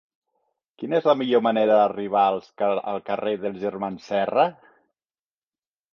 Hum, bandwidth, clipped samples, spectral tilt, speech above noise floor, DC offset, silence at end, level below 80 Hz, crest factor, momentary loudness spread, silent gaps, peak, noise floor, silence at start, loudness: none; 6.8 kHz; under 0.1%; -7 dB/octave; over 68 dB; under 0.1%; 1.4 s; -70 dBFS; 20 dB; 10 LU; none; -4 dBFS; under -90 dBFS; 0.8 s; -23 LUFS